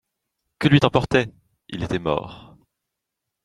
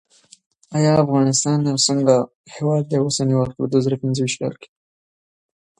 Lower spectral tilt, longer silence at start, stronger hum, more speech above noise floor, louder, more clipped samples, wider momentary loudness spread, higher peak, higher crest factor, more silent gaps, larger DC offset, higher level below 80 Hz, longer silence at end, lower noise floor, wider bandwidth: first, -7 dB/octave vs -5 dB/octave; about the same, 0.6 s vs 0.7 s; neither; second, 62 dB vs over 72 dB; about the same, -21 LUFS vs -19 LUFS; neither; first, 16 LU vs 10 LU; about the same, 0 dBFS vs -2 dBFS; about the same, 22 dB vs 18 dB; second, none vs 2.35-2.44 s; neither; first, -48 dBFS vs -56 dBFS; about the same, 1.05 s vs 1.15 s; second, -82 dBFS vs under -90 dBFS; about the same, 11 kHz vs 11.5 kHz